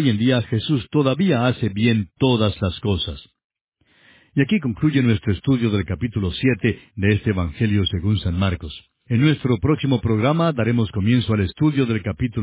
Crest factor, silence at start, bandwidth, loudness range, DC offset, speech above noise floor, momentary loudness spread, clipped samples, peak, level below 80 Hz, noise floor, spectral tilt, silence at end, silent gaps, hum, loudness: 16 dB; 0 s; 4 kHz; 3 LU; under 0.1%; 36 dB; 5 LU; under 0.1%; -4 dBFS; -38 dBFS; -55 dBFS; -11.5 dB/octave; 0 s; 3.44-3.50 s, 3.61-3.72 s; none; -20 LUFS